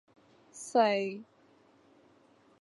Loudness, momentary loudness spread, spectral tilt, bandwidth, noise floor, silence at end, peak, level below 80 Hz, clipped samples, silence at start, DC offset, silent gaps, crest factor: -30 LUFS; 21 LU; -4 dB/octave; 11.5 kHz; -64 dBFS; 1.4 s; -12 dBFS; -86 dBFS; under 0.1%; 0.55 s; under 0.1%; none; 22 dB